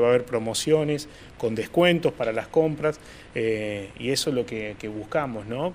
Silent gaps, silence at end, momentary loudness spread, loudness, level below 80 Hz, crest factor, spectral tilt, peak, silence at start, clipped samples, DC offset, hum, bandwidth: none; 0 s; 11 LU; -25 LUFS; -52 dBFS; 20 dB; -5 dB/octave; -6 dBFS; 0 s; under 0.1%; under 0.1%; none; 15.5 kHz